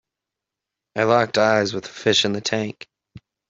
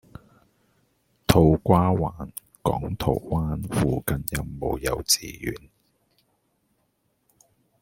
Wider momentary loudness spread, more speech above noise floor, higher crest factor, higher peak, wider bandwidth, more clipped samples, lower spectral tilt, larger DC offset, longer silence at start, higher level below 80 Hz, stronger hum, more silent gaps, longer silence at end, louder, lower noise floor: about the same, 13 LU vs 15 LU; first, 65 dB vs 47 dB; about the same, 20 dB vs 24 dB; about the same, -2 dBFS vs -2 dBFS; second, 8.2 kHz vs 16.5 kHz; neither; about the same, -4 dB/octave vs -5 dB/octave; neither; second, 0.95 s vs 1.3 s; second, -62 dBFS vs -42 dBFS; neither; neither; second, 0.3 s vs 2.25 s; first, -20 LUFS vs -24 LUFS; first, -85 dBFS vs -71 dBFS